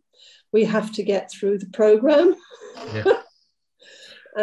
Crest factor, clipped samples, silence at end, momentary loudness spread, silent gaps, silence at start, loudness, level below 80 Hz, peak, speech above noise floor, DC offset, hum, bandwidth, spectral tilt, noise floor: 18 dB; under 0.1%; 0 s; 16 LU; none; 0.55 s; -20 LUFS; -64 dBFS; -4 dBFS; 47 dB; under 0.1%; none; 11 kHz; -6 dB/octave; -67 dBFS